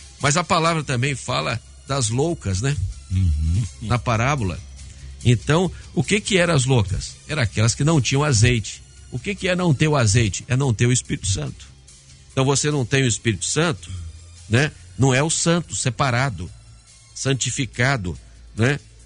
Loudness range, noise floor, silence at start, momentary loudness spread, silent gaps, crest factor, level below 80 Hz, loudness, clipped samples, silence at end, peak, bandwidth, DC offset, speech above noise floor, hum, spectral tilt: 3 LU; -46 dBFS; 0 s; 13 LU; none; 18 dB; -38 dBFS; -21 LUFS; under 0.1%; 0.25 s; -2 dBFS; 11 kHz; under 0.1%; 26 dB; none; -4.5 dB/octave